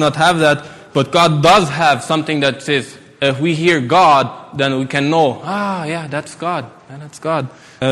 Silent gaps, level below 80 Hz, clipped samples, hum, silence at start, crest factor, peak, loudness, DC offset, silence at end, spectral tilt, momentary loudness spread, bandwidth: none; -50 dBFS; under 0.1%; none; 0 s; 14 dB; 0 dBFS; -15 LUFS; under 0.1%; 0 s; -5 dB/octave; 13 LU; 14 kHz